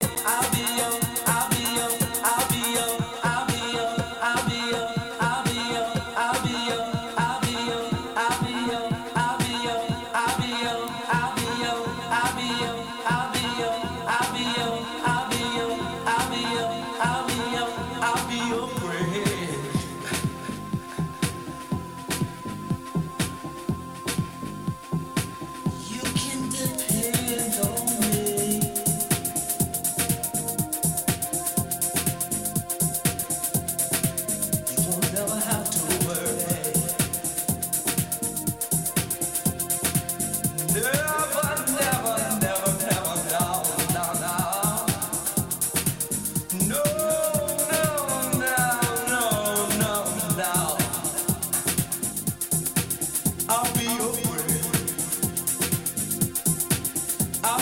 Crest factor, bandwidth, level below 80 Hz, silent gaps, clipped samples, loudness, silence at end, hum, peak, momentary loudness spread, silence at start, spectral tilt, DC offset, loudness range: 18 dB; 17 kHz; -52 dBFS; none; under 0.1%; -25 LUFS; 0 s; none; -8 dBFS; 6 LU; 0 s; -3 dB/octave; under 0.1%; 5 LU